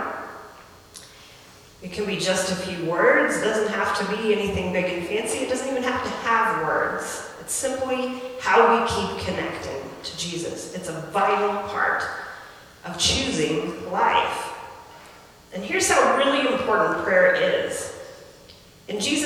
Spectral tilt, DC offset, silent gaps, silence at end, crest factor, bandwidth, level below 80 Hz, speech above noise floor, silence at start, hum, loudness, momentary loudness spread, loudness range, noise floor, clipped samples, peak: -3 dB/octave; under 0.1%; none; 0 s; 22 dB; 19 kHz; -52 dBFS; 26 dB; 0 s; none; -23 LUFS; 18 LU; 4 LU; -48 dBFS; under 0.1%; -2 dBFS